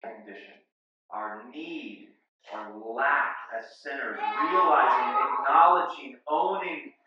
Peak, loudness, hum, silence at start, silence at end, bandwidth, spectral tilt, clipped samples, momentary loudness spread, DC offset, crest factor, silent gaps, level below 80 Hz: -6 dBFS; -25 LUFS; none; 0.05 s; 0.15 s; 7.2 kHz; -4.5 dB/octave; under 0.1%; 20 LU; under 0.1%; 22 dB; 0.72-1.09 s, 2.28-2.39 s; under -90 dBFS